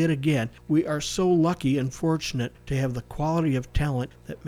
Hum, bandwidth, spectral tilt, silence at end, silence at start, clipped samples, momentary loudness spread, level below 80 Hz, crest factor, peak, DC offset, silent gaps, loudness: none; 15.5 kHz; -6 dB/octave; 0 s; 0 s; under 0.1%; 7 LU; -40 dBFS; 14 dB; -12 dBFS; under 0.1%; none; -26 LUFS